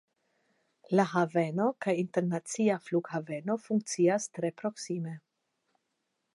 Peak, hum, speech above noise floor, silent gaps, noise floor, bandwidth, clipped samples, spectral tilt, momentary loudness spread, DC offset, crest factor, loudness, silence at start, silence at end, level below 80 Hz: -10 dBFS; none; 51 dB; none; -81 dBFS; 11.5 kHz; under 0.1%; -6 dB/octave; 9 LU; under 0.1%; 20 dB; -31 LUFS; 0.9 s; 1.15 s; -84 dBFS